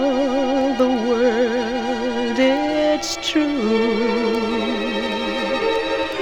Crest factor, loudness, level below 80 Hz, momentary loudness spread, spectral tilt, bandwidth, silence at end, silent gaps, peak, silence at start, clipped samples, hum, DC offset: 14 dB; -19 LUFS; -48 dBFS; 4 LU; -4 dB/octave; 17.5 kHz; 0 s; none; -6 dBFS; 0 s; under 0.1%; none; under 0.1%